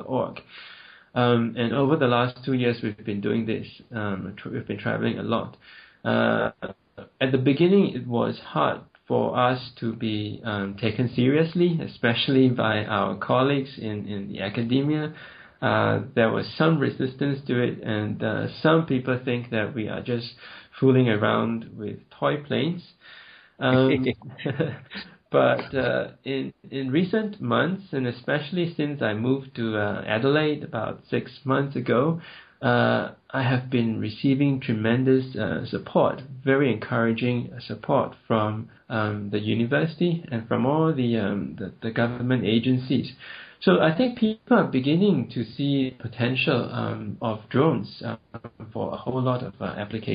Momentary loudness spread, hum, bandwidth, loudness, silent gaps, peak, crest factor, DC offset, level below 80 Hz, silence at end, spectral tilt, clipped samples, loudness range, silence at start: 11 LU; none; 5.2 kHz; -25 LUFS; none; -6 dBFS; 18 dB; under 0.1%; -62 dBFS; 0 s; -5.5 dB/octave; under 0.1%; 3 LU; 0 s